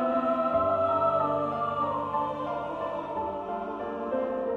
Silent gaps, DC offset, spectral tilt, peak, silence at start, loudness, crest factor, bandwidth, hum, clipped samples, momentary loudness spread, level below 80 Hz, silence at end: none; under 0.1%; -8 dB/octave; -14 dBFS; 0 s; -29 LUFS; 14 dB; 7 kHz; none; under 0.1%; 9 LU; -58 dBFS; 0 s